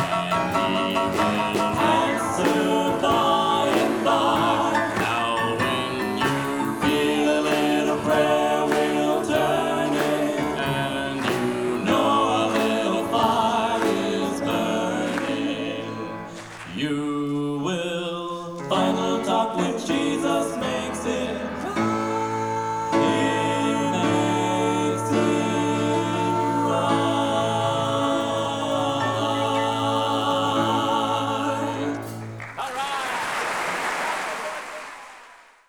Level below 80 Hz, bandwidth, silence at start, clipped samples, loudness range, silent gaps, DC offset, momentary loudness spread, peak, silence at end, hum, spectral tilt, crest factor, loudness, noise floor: -56 dBFS; 20 kHz; 0 s; under 0.1%; 5 LU; none; under 0.1%; 8 LU; -8 dBFS; 0.3 s; none; -4.5 dB/octave; 16 dB; -23 LUFS; -48 dBFS